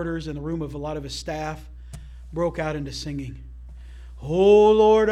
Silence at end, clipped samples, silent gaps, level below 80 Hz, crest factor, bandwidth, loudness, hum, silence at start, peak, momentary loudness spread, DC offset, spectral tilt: 0 s; under 0.1%; none; -40 dBFS; 18 dB; 10.5 kHz; -22 LUFS; 60 Hz at -40 dBFS; 0 s; -6 dBFS; 27 LU; under 0.1%; -6 dB/octave